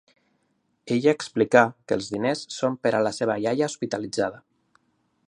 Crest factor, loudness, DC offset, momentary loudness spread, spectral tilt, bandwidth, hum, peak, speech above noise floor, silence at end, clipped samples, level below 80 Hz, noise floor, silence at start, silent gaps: 24 dB; -24 LUFS; under 0.1%; 9 LU; -5 dB/octave; 11 kHz; none; -2 dBFS; 47 dB; 0.9 s; under 0.1%; -66 dBFS; -71 dBFS; 0.85 s; none